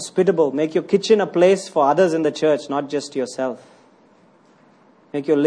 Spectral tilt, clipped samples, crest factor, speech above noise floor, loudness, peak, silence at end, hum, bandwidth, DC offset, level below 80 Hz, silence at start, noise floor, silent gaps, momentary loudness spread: -5.5 dB/octave; under 0.1%; 16 dB; 35 dB; -19 LUFS; -4 dBFS; 0 s; none; 10.5 kHz; under 0.1%; -68 dBFS; 0 s; -53 dBFS; none; 11 LU